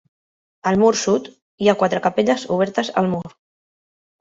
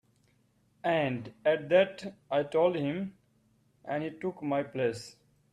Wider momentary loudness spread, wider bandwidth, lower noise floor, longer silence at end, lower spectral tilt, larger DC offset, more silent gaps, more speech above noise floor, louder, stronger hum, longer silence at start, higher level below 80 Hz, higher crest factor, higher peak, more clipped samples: second, 7 LU vs 15 LU; second, 8 kHz vs 10.5 kHz; first, under -90 dBFS vs -69 dBFS; first, 0.9 s vs 0.4 s; second, -5 dB/octave vs -6.5 dB/octave; neither; first, 1.42-1.58 s vs none; first, over 72 dB vs 39 dB; first, -19 LUFS vs -31 LUFS; neither; second, 0.65 s vs 0.85 s; first, -60 dBFS vs -72 dBFS; about the same, 18 dB vs 20 dB; first, -2 dBFS vs -12 dBFS; neither